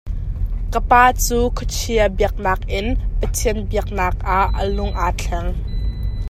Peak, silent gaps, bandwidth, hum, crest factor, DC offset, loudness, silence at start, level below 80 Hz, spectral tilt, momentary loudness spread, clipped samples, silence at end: 0 dBFS; none; 15 kHz; none; 18 dB; under 0.1%; -20 LUFS; 0.05 s; -22 dBFS; -4.5 dB/octave; 11 LU; under 0.1%; 0 s